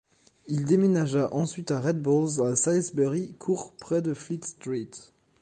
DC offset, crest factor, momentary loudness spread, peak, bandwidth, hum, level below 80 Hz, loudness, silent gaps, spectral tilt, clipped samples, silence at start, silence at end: under 0.1%; 16 dB; 11 LU; -10 dBFS; 10 kHz; none; -66 dBFS; -27 LUFS; none; -6 dB/octave; under 0.1%; 0.45 s; 0.45 s